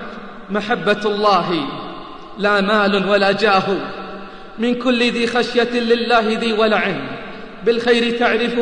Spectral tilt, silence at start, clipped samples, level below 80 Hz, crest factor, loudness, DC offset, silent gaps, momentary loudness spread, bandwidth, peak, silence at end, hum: -5 dB/octave; 0 s; under 0.1%; -48 dBFS; 16 dB; -17 LUFS; 0.7%; none; 17 LU; 10 kHz; -2 dBFS; 0 s; none